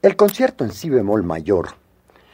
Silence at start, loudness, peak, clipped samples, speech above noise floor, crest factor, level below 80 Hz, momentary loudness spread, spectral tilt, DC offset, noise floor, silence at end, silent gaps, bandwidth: 0.05 s; -19 LUFS; -2 dBFS; under 0.1%; 36 dB; 18 dB; -50 dBFS; 7 LU; -6.5 dB/octave; under 0.1%; -53 dBFS; 0.6 s; none; 16.5 kHz